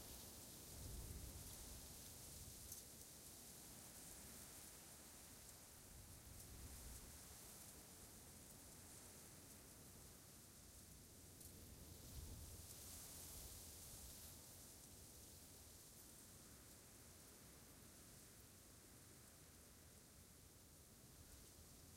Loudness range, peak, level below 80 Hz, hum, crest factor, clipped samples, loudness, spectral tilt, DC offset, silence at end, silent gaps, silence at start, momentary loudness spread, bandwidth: 6 LU; -40 dBFS; -68 dBFS; none; 20 dB; under 0.1%; -59 LUFS; -3 dB/octave; under 0.1%; 0 s; none; 0 s; 8 LU; 16 kHz